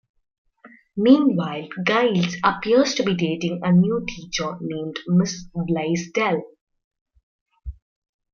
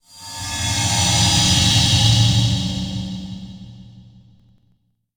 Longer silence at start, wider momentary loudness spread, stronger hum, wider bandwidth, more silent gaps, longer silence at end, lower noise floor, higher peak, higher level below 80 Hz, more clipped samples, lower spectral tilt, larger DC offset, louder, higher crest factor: first, 0.65 s vs 0.15 s; second, 12 LU vs 19 LU; neither; second, 7.2 kHz vs over 20 kHz; first, 6.61-6.67 s, 6.84-6.91 s, 7.01-7.06 s, 7.23-7.46 s vs none; second, 0.6 s vs 1.15 s; second, -51 dBFS vs -63 dBFS; about the same, -2 dBFS vs -2 dBFS; second, -50 dBFS vs -36 dBFS; neither; first, -6 dB/octave vs -3 dB/octave; neither; second, -21 LUFS vs -16 LUFS; about the same, 20 dB vs 16 dB